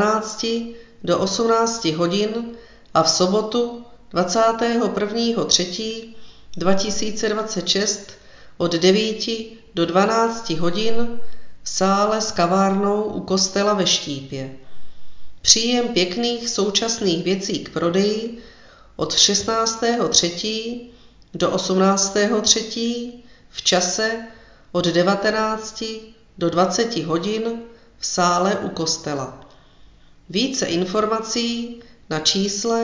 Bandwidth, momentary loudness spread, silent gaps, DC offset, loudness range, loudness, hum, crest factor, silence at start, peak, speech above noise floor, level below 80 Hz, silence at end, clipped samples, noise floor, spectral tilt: 7.6 kHz; 13 LU; none; under 0.1%; 3 LU; -20 LUFS; none; 20 dB; 0 s; 0 dBFS; 28 dB; -52 dBFS; 0 s; under 0.1%; -48 dBFS; -3 dB/octave